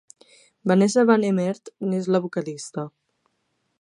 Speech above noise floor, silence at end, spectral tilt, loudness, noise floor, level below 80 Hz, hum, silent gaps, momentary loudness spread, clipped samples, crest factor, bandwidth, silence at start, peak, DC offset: 51 dB; 0.9 s; -6.5 dB/octave; -22 LUFS; -73 dBFS; -74 dBFS; none; none; 15 LU; under 0.1%; 20 dB; 11 kHz; 0.65 s; -4 dBFS; under 0.1%